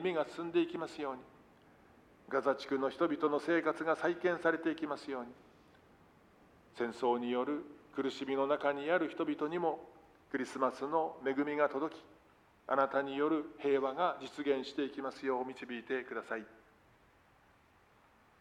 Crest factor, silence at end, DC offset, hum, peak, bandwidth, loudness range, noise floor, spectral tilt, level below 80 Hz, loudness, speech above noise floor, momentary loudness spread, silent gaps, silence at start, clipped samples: 20 dB; 1.85 s; under 0.1%; none; -16 dBFS; 11.5 kHz; 5 LU; -67 dBFS; -5.5 dB/octave; -76 dBFS; -36 LUFS; 31 dB; 10 LU; none; 0 s; under 0.1%